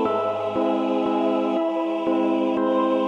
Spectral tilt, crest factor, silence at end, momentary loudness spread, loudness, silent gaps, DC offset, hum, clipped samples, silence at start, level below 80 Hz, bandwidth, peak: -7 dB/octave; 12 dB; 0 s; 3 LU; -23 LUFS; none; under 0.1%; none; under 0.1%; 0 s; -66 dBFS; 7 kHz; -10 dBFS